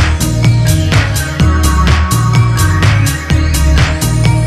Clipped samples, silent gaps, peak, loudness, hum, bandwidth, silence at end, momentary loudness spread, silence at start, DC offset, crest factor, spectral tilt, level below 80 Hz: under 0.1%; none; 0 dBFS; -11 LUFS; none; 14 kHz; 0 s; 2 LU; 0 s; 0.3%; 10 dB; -5 dB/octave; -16 dBFS